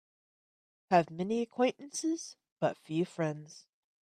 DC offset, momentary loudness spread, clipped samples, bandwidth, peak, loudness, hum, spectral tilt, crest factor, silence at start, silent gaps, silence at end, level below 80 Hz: under 0.1%; 11 LU; under 0.1%; 13.5 kHz; -10 dBFS; -33 LUFS; none; -5.5 dB/octave; 24 dB; 0.9 s; 2.52-2.56 s; 0.4 s; -80 dBFS